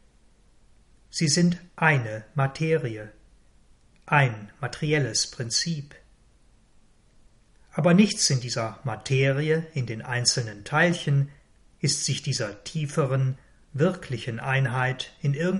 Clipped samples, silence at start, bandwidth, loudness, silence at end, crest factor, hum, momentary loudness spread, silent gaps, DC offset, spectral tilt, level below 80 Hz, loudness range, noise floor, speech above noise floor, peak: under 0.1%; 1.15 s; 11.5 kHz; -25 LUFS; 0 s; 22 dB; none; 11 LU; none; under 0.1%; -4.5 dB/octave; -58 dBFS; 3 LU; -58 dBFS; 33 dB; -6 dBFS